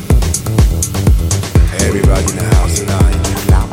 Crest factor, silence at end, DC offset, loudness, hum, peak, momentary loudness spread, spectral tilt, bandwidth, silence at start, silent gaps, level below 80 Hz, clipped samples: 10 dB; 0 s; under 0.1%; -13 LUFS; none; 0 dBFS; 2 LU; -5 dB/octave; 17 kHz; 0 s; none; -14 dBFS; under 0.1%